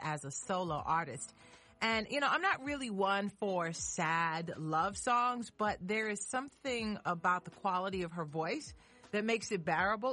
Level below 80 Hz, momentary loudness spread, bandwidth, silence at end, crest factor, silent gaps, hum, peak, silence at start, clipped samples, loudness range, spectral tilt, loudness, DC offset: -64 dBFS; 7 LU; 11.5 kHz; 0 s; 16 dB; none; none; -20 dBFS; 0 s; under 0.1%; 3 LU; -4 dB/octave; -35 LUFS; under 0.1%